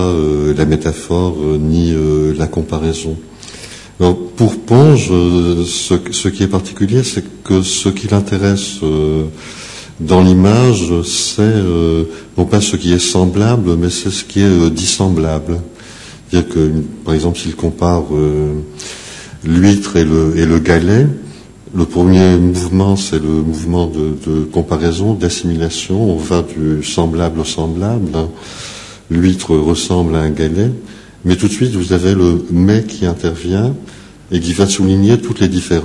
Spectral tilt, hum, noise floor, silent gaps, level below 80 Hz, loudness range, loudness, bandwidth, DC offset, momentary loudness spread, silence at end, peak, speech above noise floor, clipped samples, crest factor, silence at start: -6 dB/octave; none; -34 dBFS; none; -32 dBFS; 4 LU; -13 LUFS; 12 kHz; under 0.1%; 12 LU; 0 s; 0 dBFS; 21 dB; 0.3%; 12 dB; 0 s